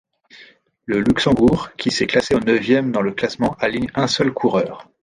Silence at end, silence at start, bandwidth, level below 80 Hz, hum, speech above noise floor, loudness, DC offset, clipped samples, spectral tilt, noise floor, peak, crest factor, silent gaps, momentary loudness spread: 0.2 s; 0.4 s; 11 kHz; -46 dBFS; none; 30 dB; -18 LUFS; under 0.1%; under 0.1%; -5.5 dB/octave; -48 dBFS; -2 dBFS; 16 dB; none; 6 LU